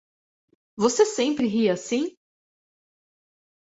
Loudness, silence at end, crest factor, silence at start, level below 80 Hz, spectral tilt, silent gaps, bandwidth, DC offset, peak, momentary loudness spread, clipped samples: -23 LUFS; 1.6 s; 20 dB; 0.75 s; -68 dBFS; -4 dB/octave; none; 8 kHz; under 0.1%; -6 dBFS; 7 LU; under 0.1%